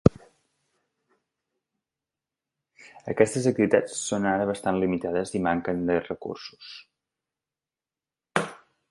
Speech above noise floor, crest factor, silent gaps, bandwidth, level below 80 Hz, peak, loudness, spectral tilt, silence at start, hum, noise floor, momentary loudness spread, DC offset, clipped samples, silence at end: over 64 dB; 28 dB; none; 11.5 kHz; -50 dBFS; 0 dBFS; -26 LUFS; -5.5 dB/octave; 0.05 s; none; under -90 dBFS; 17 LU; under 0.1%; under 0.1%; 0.35 s